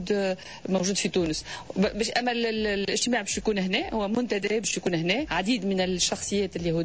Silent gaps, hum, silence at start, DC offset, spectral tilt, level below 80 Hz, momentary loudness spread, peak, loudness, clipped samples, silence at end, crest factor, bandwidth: none; none; 0 s; 0.2%; -3.5 dB/octave; -50 dBFS; 3 LU; -12 dBFS; -26 LUFS; under 0.1%; 0 s; 14 dB; 8 kHz